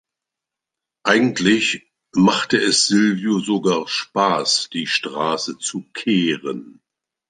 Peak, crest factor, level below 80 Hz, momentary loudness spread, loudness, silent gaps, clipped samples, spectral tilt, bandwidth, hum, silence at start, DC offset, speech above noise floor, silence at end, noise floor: -2 dBFS; 18 dB; -62 dBFS; 10 LU; -18 LUFS; none; under 0.1%; -3.5 dB/octave; 9.8 kHz; none; 1.05 s; under 0.1%; 67 dB; 0.6 s; -85 dBFS